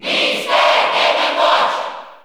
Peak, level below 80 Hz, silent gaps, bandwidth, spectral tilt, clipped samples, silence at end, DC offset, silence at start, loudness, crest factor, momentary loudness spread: -2 dBFS; -68 dBFS; none; 17.5 kHz; -1.5 dB/octave; under 0.1%; 0.1 s; under 0.1%; 0 s; -14 LUFS; 14 dB; 7 LU